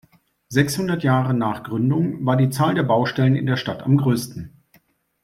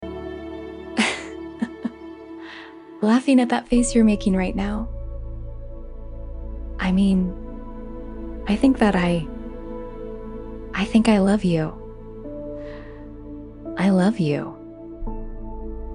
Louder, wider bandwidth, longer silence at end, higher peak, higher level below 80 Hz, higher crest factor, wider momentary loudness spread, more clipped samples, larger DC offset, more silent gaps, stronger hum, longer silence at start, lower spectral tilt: about the same, -20 LUFS vs -21 LUFS; first, 15 kHz vs 11 kHz; first, 0.75 s vs 0 s; about the same, -2 dBFS vs -4 dBFS; second, -56 dBFS vs -36 dBFS; about the same, 20 dB vs 18 dB; second, 6 LU vs 21 LU; neither; neither; neither; neither; first, 0.5 s vs 0 s; about the same, -6.5 dB/octave vs -6 dB/octave